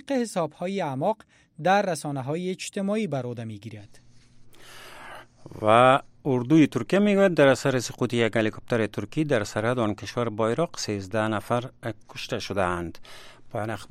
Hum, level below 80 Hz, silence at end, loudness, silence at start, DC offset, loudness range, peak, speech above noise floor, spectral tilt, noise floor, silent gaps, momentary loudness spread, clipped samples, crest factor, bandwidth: none; -58 dBFS; 0.05 s; -25 LUFS; 0.1 s; under 0.1%; 8 LU; -4 dBFS; 25 dB; -5.5 dB/octave; -49 dBFS; none; 17 LU; under 0.1%; 22 dB; 15.5 kHz